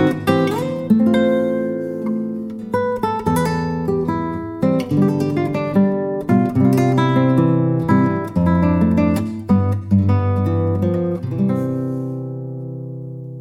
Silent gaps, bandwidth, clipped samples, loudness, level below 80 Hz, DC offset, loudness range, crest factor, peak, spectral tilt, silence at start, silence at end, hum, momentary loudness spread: none; 16 kHz; under 0.1%; -18 LUFS; -44 dBFS; under 0.1%; 4 LU; 16 dB; -2 dBFS; -8.5 dB/octave; 0 s; 0 s; none; 10 LU